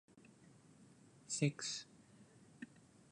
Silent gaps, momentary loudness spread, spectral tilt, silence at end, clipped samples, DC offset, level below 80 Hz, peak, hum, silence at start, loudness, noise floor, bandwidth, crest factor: none; 26 LU; -4 dB/octave; 0.45 s; under 0.1%; under 0.1%; -84 dBFS; -22 dBFS; none; 0.15 s; -41 LUFS; -65 dBFS; 11 kHz; 26 dB